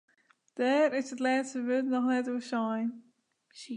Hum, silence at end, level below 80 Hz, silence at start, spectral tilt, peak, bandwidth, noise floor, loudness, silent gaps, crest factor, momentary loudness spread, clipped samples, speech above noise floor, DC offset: none; 0 s; -88 dBFS; 0.55 s; -4.5 dB/octave; -16 dBFS; 10 kHz; -64 dBFS; -30 LUFS; none; 14 dB; 9 LU; under 0.1%; 34 dB; under 0.1%